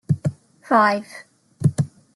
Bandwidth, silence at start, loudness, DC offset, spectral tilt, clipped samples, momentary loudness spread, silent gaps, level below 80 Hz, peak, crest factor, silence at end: 12 kHz; 0.1 s; -21 LUFS; under 0.1%; -7 dB/octave; under 0.1%; 17 LU; none; -58 dBFS; -6 dBFS; 16 dB; 0.3 s